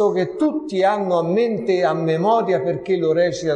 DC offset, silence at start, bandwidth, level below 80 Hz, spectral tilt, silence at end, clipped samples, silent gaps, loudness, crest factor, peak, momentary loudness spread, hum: under 0.1%; 0 s; 9.4 kHz; -60 dBFS; -6.5 dB/octave; 0 s; under 0.1%; none; -19 LUFS; 14 dB; -6 dBFS; 3 LU; none